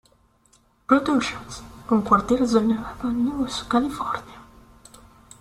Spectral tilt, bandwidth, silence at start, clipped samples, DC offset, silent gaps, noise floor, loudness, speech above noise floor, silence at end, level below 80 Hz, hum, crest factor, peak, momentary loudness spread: -5.5 dB/octave; 13.5 kHz; 0.9 s; under 0.1%; under 0.1%; none; -60 dBFS; -22 LUFS; 38 dB; 0.95 s; -48 dBFS; none; 22 dB; -2 dBFS; 14 LU